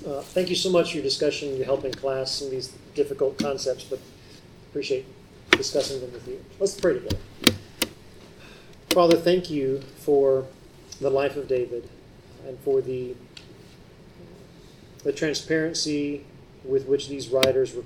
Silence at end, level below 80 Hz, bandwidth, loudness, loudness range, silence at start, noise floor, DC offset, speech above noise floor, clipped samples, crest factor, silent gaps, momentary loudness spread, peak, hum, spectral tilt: 0 s; -52 dBFS; 18 kHz; -25 LUFS; 7 LU; 0 s; -48 dBFS; under 0.1%; 24 dB; under 0.1%; 26 dB; none; 16 LU; 0 dBFS; none; -4 dB/octave